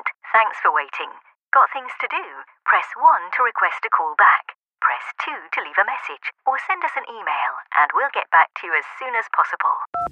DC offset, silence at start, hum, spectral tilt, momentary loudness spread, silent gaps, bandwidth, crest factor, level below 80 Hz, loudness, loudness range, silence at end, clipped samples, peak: under 0.1%; 0.05 s; none; -2.5 dB/octave; 11 LU; 1.36-1.51 s, 4.55-4.59 s, 9.87-9.93 s; 8.4 kHz; 18 dB; -72 dBFS; -20 LUFS; 4 LU; 0 s; under 0.1%; -4 dBFS